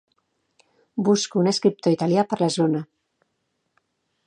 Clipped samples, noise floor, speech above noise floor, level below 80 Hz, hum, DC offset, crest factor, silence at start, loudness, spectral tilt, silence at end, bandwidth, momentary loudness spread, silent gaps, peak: under 0.1%; -74 dBFS; 54 dB; -72 dBFS; none; under 0.1%; 18 dB; 0.95 s; -22 LUFS; -5.5 dB/octave; 1.45 s; 10 kHz; 8 LU; none; -6 dBFS